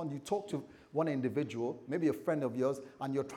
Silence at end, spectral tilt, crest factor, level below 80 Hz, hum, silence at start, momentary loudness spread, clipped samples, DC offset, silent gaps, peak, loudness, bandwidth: 0 s; -7 dB/octave; 16 dB; -78 dBFS; none; 0 s; 7 LU; under 0.1%; under 0.1%; none; -20 dBFS; -36 LUFS; 16.5 kHz